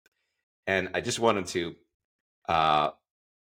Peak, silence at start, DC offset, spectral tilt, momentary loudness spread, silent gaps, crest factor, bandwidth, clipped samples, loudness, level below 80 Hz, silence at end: -8 dBFS; 0.65 s; under 0.1%; -3.5 dB/octave; 13 LU; 1.94-2.42 s; 22 dB; 16.5 kHz; under 0.1%; -27 LUFS; -60 dBFS; 0.55 s